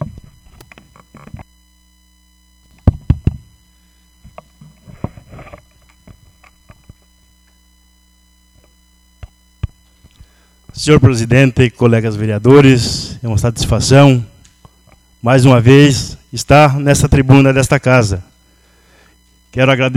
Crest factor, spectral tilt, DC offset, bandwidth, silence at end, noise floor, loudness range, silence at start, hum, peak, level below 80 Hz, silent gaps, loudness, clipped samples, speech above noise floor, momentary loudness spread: 14 dB; -6 dB/octave; under 0.1%; 13.5 kHz; 0 s; -51 dBFS; 13 LU; 0 s; 60 Hz at -40 dBFS; 0 dBFS; -30 dBFS; none; -11 LUFS; 0.5%; 42 dB; 21 LU